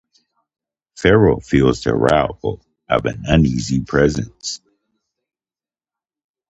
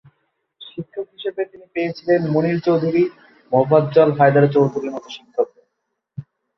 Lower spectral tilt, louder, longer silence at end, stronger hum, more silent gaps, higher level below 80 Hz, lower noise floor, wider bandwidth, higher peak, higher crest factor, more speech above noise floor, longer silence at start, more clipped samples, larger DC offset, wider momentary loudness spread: second, -6 dB/octave vs -8.5 dB/octave; about the same, -17 LUFS vs -18 LUFS; first, 1.95 s vs 0.35 s; neither; neither; first, -34 dBFS vs -62 dBFS; first, under -90 dBFS vs -76 dBFS; first, 9.8 kHz vs 6.4 kHz; about the same, 0 dBFS vs 0 dBFS; about the same, 18 dB vs 18 dB; first, over 74 dB vs 58 dB; first, 0.95 s vs 0.6 s; neither; neither; second, 13 LU vs 19 LU